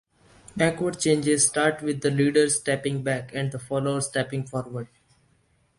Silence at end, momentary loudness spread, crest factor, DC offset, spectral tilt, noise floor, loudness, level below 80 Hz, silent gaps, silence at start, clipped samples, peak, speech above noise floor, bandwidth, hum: 0.95 s; 12 LU; 18 dB; under 0.1%; -4 dB/octave; -65 dBFS; -24 LUFS; -60 dBFS; none; 0.55 s; under 0.1%; -6 dBFS; 41 dB; 11.5 kHz; none